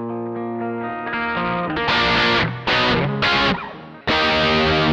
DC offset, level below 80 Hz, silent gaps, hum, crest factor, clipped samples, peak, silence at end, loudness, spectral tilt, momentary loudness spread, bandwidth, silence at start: under 0.1%; -40 dBFS; none; none; 12 dB; under 0.1%; -8 dBFS; 0 s; -19 LUFS; -5.5 dB/octave; 10 LU; 9 kHz; 0 s